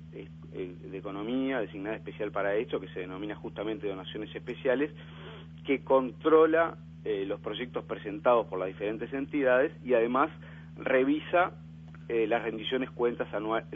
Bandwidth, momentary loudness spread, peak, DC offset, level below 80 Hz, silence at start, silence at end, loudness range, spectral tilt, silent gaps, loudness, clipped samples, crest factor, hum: 3.8 kHz; 15 LU; -10 dBFS; under 0.1%; -60 dBFS; 0 s; 0 s; 6 LU; -8.5 dB/octave; none; -30 LUFS; under 0.1%; 20 dB; none